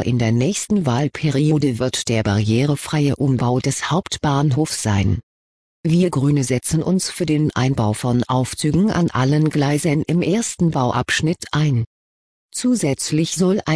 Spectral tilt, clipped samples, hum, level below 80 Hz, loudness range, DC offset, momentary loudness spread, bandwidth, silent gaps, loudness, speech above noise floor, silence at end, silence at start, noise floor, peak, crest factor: -5.5 dB/octave; under 0.1%; none; -44 dBFS; 2 LU; 0.1%; 3 LU; 11 kHz; 5.23-5.83 s, 11.87-12.49 s; -19 LUFS; over 72 dB; 0 s; 0 s; under -90 dBFS; -4 dBFS; 14 dB